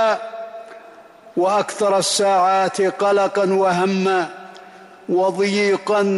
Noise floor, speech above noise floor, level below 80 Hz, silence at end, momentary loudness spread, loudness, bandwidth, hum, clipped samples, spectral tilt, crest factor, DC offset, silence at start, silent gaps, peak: -43 dBFS; 26 dB; -68 dBFS; 0 s; 18 LU; -18 LUFS; 12 kHz; none; under 0.1%; -4 dB/octave; 12 dB; under 0.1%; 0 s; none; -8 dBFS